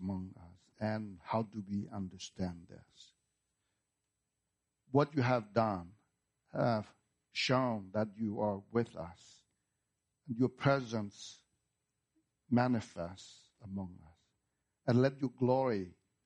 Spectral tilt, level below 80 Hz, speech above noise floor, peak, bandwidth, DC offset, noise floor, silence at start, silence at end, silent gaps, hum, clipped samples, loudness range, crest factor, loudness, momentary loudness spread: -6.5 dB/octave; -72 dBFS; 52 dB; -14 dBFS; 9.8 kHz; under 0.1%; -87 dBFS; 0 s; 0.35 s; none; none; under 0.1%; 6 LU; 22 dB; -36 LUFS; 17 LU